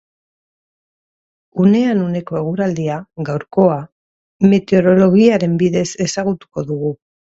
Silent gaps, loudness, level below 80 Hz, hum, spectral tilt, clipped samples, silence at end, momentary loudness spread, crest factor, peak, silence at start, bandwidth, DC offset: 3.92-4.39 s; -16 LUFS; -54 dBFS; none; -7 dB/octave; under 0.1%; 0.45 s; 13 LU; 16 dB; 0 dBFS; 1.55 s; 8 kHz; under 0.1%